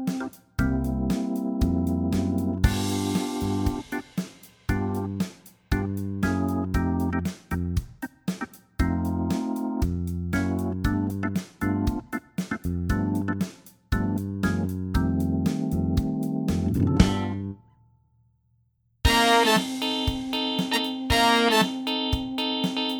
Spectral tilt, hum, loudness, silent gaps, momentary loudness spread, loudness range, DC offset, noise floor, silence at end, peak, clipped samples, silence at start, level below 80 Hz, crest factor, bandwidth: -5.5 dB/octave; none; -26 LUFS; none; 11 LU; 6 LU; under 0.1%; -67 dBFS; 0 s; -2 dBFS; under 0.1%; 0 s; -36 dBFS; 24 dB; over 20 kHz